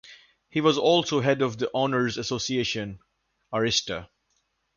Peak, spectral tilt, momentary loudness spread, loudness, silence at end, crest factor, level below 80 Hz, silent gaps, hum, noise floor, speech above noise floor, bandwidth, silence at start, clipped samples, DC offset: -8 dBFS; -4 dB/octave; 11 LU; -25 LUFS; 0.7 s; 18 dB; -58 dBFS; none; none; -73 dBFS; 48 dB; 7.4 kHz; 0.05 s; under 0.1%; under 0.1%